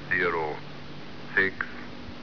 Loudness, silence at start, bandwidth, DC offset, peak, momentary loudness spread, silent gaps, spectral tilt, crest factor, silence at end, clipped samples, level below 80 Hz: -28 LUFS; 0 s; 5.4 kHz; 0.9%; -10 dBFS; 17 LU; none; -6 dB/octave; 20 dB; 0 s; under 0.1%; -56 dBFS